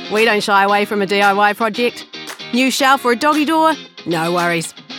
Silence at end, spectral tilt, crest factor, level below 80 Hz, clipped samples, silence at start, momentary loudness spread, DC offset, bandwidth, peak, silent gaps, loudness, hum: 0 s; -3.5 dB/octave; 14 dB; -72 dBFS; under 0.1%; 0 s; 9 LU; under 0.1%; 18 kHz; 0 dBFS; none; -15 LUFS; none